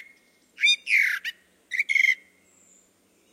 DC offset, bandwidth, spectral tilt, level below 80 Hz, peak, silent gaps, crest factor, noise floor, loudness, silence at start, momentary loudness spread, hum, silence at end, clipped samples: under 0.1%; 16 kHz; 4 dB/octave; -86 dBFS; -10 dBFS; none; 18 dB; -63 dBFS; -22 LUFS; 0.6 s; 11 LU; none; 1.15 s; under 0.1%